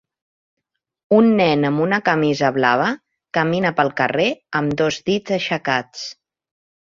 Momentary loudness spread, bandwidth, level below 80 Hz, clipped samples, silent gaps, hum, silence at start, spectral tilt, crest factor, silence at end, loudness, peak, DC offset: 8 LU; 7.6 kHz; -58 dBFS; under 0.1%; none; none; 1.1 s; -5.5 dB/octave; 18 dB; 0.75 s; -18 LUFS; -2 dBFS; under 0.1%